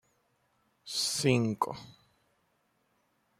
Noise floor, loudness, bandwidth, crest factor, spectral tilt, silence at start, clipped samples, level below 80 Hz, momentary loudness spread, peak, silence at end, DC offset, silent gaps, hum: -74 dBFS; -30 LUFS; 16 kHz; 24 dB; -4 dB/octave; 0.85 s; under 0.1%; -70 dBFS; 9 LU; -12 dBFS; 1.5 s; under 0.1%; none; none